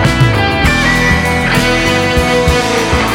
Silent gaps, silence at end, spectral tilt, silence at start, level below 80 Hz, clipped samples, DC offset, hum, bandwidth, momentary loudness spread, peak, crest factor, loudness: none; 0 s; -4.5 dB/octave; 0 s; -22 dBFS; under 0.1%; under 0.1%; none; 18.5 kHz; 2 LU; 0 dBFS; 10 dB; -11 LUFS